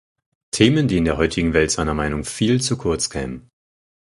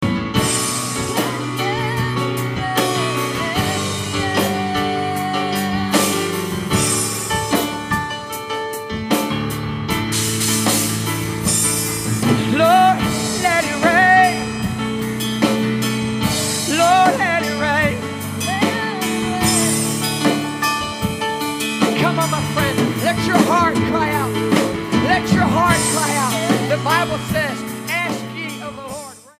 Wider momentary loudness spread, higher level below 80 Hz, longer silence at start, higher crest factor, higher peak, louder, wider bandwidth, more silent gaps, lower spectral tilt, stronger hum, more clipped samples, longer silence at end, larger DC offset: first, 12 LU vs 8 LU; first, -36 dBFS vs -44 dBFS; first, 0.55 s vs 0 s; about the same, 20 dB vs 18 dB; about the same, 0 dBFS vs 0 dBFS; about the same, -19 LUFS vs -18 LUFS; second, 11.5 kHz vs 15.5 kHz; neither; about the same, -4.5 dB/octave vs -4 dB/octave; neither; neither; first, 0.6 s vs 0.2 s; neither